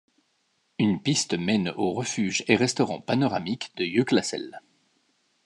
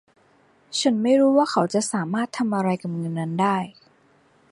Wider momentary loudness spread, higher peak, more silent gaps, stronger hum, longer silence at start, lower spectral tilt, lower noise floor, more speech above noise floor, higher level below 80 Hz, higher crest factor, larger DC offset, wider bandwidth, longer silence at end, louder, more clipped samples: about the same, 9 LU vs 10 LU; about the same, -6 dBFS vs -6 dBFS; neither; neither; about the same, 0.8 s vs 0.7 s; about the same, -4.5 dB/octave vs -5 dB/octave; first, -71 dBFS vs -59 dBFS; first, 46 dB vs 37 dB; about the same, -68 dBFS vs -70 dBFS; about the same, 22 dB vs 18 dB; neither; about the same, 11.5 kHz vs 11.5 kHz; about the same, 0.85 s vs 0.8 s; second, -25 LUFS vs -22 LUFS; neither